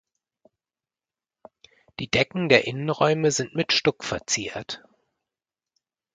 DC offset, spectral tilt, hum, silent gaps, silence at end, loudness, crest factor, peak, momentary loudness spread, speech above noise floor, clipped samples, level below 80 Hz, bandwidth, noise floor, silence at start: under 0.1%; -3.5 dB/octave; none; none; 1.35 s; -23 LUFS; 26 dB; 0 dBFS; 17 LU; over 66 dB; under 0.1%; -58 dBFS; 9.6 kHz; under -90 dBFS; 2 s